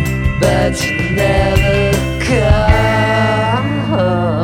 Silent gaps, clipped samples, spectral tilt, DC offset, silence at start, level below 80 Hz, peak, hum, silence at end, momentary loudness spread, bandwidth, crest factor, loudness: none; under 0.1%; -6 dB/octave; under 0.1%; 0 s; -22 dBFS; 0 dBFS; none; 0 s; 4 LU; 16.5 kHz; 12 dB; -13 LUFS